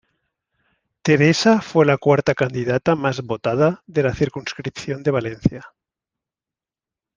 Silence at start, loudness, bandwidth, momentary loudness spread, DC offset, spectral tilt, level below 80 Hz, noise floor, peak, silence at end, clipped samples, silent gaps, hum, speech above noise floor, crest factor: 1.05 s; -19 LUFS; 9.6 kHz; 11 LU; under 0.1%; -6 dB/octave; -48 dBFS; -90 dBFS; -2 dBFS; 1.5 s; under 0.1%; none; none; 71 dB; 20 dB